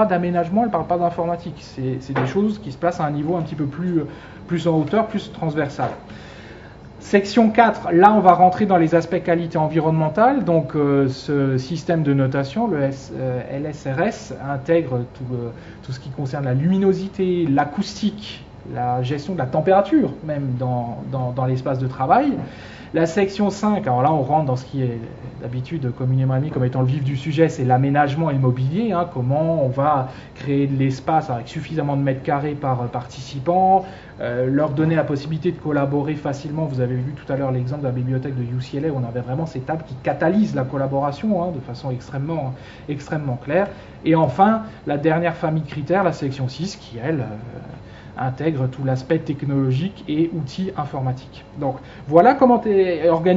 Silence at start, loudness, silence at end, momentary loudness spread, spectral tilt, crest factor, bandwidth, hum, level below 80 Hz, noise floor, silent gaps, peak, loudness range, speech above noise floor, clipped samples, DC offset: 0 s; -20 LUFS; 0 s; 12 LU; -8 dB/octave; 20 dB; 7.8 kHz; none; -50 dBFS; -40 dBFS; none; 0 dBFS; 7 LU; 20 dB; under 0.1%; under 0.1%